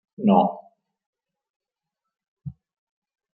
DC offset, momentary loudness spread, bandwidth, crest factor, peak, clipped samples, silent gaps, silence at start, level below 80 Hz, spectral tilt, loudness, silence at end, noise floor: under 0.1%; 23 LU; 4 kHz; 24 dB; -4 dBFS; under 0.1%; 1.06-1.13 s, 1.50-1.60 s, 2.28-2.37 s; 0.2 s; -64 dBFS; -12 dB/octave; -20 LUFS; 0.85 s; -86 dBFS